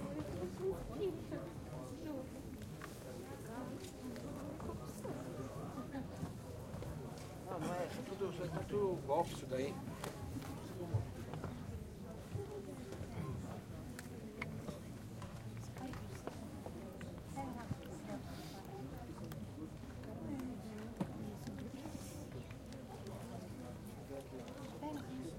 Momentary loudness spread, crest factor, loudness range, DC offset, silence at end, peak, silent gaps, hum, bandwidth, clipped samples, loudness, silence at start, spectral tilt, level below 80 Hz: 8 LU; 22 dB; 7 LU; under 0.1%; 0 s; -22 dBFS; none; none; 16.5 kHz; under 0.1%; -46 LUFS; 0 s; -6.5 dB/octave; -60 dBFS